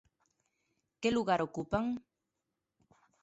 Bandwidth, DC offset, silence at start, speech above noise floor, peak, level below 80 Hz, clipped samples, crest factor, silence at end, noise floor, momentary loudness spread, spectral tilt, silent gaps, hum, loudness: 8 kHz; under 0.1%; 1 s; 54 dB; -18 dBFS; -62 dBFS; under 0.1%; 20 dB; 1.25 s; -87 dBFS; 7 LU; -4.5 dB/octave; none; none; -34 LUFS